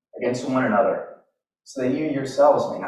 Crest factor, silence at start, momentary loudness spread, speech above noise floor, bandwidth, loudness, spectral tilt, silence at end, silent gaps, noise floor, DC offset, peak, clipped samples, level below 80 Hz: 18 dB; 0.15 s; 12 LU; 41 dB; 11.5 kHz; -22 LUFS; -6 dB/octave; 0 s; none; -62 dBFS; under 0.1%; -6 dBFS; under 0.1%; -64 dBFS